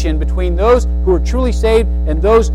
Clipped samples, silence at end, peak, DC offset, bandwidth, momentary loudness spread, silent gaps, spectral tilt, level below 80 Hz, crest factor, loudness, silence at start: under 0.1%; 0 s; -2 dBFS; under 0.1%; 10.5 kHz; 5 LU; none; -7 dB/octave; -16 dBFS; 10 dB; -14 LUFS; 0 s